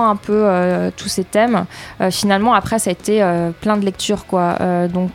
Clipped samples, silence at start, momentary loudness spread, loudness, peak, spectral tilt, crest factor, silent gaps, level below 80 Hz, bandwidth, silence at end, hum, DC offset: under 0.1%; 0 s; 6 LU; -17 LUFS; 0 dBFS; -5 dB/octave; 16 dB; none; -46 dBFS; 16 kHz; 0 s; none; under 0.1%